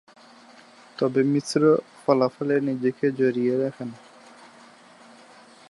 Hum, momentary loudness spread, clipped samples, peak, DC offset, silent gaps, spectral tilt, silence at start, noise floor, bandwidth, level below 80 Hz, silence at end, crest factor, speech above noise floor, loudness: none; 9 LU; under 0.1%; -6 dBFS; under 0.1%; none; -6.5 dB/octave; 1 s; -51 dBFS; 11.5 kHz; -76 dBFS; 1.75 s; 20 dB; 28 dB; -23 LUFS